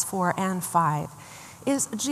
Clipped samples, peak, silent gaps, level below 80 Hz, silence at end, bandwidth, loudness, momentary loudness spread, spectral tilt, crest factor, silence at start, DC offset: under 0.1%; -8 dBFS; none; -68 dBFS; 0 s; 15 kHz; -26 LUFS; 16 LU; -4.5 dB/octave; 18 dB; 0 s; under 0.1%